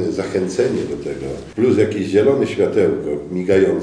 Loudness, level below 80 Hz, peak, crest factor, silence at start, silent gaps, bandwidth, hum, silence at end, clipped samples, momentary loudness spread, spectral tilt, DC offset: -18 LUFS; -48 dBFS; -2 dBFS; 16 dB; 0 s; none; 10.5 kHz; none; 0 s; under 0.1%; 10 LU; -6.5 dB/octave; 0.1%